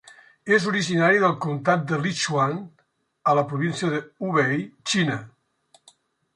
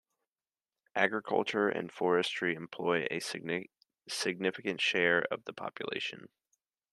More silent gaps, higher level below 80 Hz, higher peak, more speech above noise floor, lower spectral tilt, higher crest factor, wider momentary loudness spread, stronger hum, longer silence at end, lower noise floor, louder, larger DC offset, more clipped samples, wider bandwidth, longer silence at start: neither; first, -68 dBFS vs -80 dBFS; first, -6 dBFS vs -10 dBFS; second, 39 dB vs over 57 dB; first, -5 dB/octave vs -3.5 dB/octave; second, 18 dB vs 24 dB; second, 8 LU vs 11 LU; neither; first, 1.1 s vs 0.65 s; second, -61 dBFS vs under -90 dBFS; first, -23 LUFS vs -33 LUFS; neither; neither; second, 11 kHz vs 12.5 kHz; second, 0.45 s vs 0.95 s